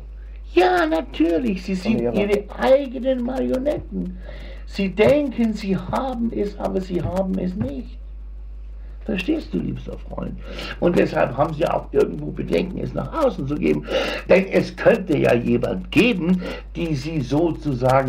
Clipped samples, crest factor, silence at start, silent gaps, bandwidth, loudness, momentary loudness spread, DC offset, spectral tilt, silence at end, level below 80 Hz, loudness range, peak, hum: under 0.1%; 18 dB; 0 s; none; 15.5 kHz; -21 LUFS; 15 LU; under 0.1%; -7 dB/octave; 0 s; -36 dBFS; 7 LU; -2 dBFS; none